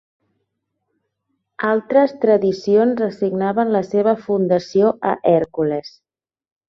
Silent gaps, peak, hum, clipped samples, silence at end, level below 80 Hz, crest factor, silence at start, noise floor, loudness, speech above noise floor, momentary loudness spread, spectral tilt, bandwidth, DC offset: none; -2 dBFS; none; under 0.1%; 0.8 s; -60 dBFS; 16 dB; 1.6 s; -75 dBFS; -18 LUFS; 58 dB; 5 LU; -7.5 dB/octave; 7 kHz; under 0.1%